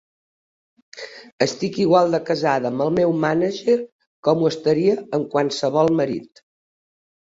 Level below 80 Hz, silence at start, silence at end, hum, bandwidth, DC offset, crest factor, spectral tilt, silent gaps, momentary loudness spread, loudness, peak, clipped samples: -62 dBFS; 0.95 s; 1.15 s; none; 8 kHz; under 0.1%; 18 dB; -6 dB/octave; 1.33-1.38 s, 3.92-3.99 s, 4.07-4.23 s; 11 LU; -20 LUFS; -4 dBFS; under 0.1%